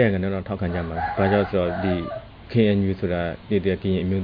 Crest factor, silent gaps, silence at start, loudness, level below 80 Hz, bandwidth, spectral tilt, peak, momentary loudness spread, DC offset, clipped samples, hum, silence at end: 18 dB; none; 0 s; -23 LUFS; -44 dBFS; 5.2 kHz; -10.5 dB/octave; -6 dBFS; 7 LU; under 0.1%; under 0.1%; none; 0 s